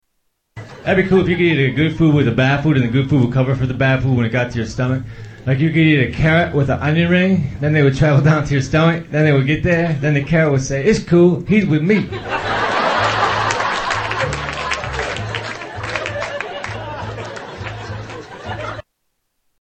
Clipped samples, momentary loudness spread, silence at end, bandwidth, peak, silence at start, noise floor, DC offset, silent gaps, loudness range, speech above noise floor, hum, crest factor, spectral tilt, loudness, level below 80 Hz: under 0.1%; 14 LU; 0.8 s; 8.6 kHz; 0 dBFS; 0.55 s; -70 dBFS; under 0.1%; none; 10 LU; 55 dB; none; 16 dB; -6.5 dB/octave; -16 LUFS; -38 dBFS